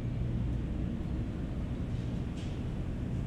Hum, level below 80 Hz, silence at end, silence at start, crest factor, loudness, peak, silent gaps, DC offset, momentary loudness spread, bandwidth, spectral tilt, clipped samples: none; -40 dBFS; 0 s; 0 s; 12 dB; -36 LUFS; -22 dBFS; none; under 0.1%; 3 LU; 9.4 kHz; -8.5 dB/octave; under 0.1%